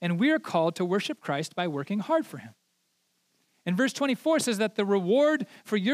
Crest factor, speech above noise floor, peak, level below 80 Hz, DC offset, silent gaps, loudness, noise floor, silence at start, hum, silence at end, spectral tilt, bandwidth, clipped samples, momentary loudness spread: 16 dB; 47 dB; -12 dBFS; -88 dBFS; under 0.1%; none; -27 LUFS; -74 dBFS; 0 s; none; 0 s; -5 dB/octave; 15.5 kHz; under 0.1%; 8 LU